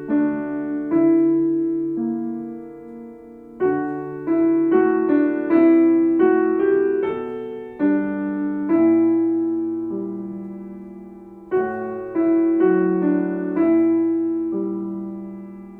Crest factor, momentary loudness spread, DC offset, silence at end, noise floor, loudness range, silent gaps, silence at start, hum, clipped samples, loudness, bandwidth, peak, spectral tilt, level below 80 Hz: 14 dB; 17 LU; under 0.1%; 0 s; -40 dBFS; 6 LU; none; 0 s; none; under 0.1%; -20 LUFS; 3.3 kHz; -6 dBFS; -11 dB/octave; -60 dBFS